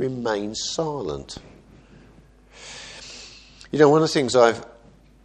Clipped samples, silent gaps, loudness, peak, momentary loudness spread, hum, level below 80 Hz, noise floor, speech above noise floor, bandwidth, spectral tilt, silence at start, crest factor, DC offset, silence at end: under 0.1%; none; -21 LUFS; -2 dBFS; 23 LU; none; -52 dBFS; -51 dBFS; 31 dB; 9.8 kHz; -4.5 dB/octave; 0 s; 22 dB; under 0.1%; 0.6 s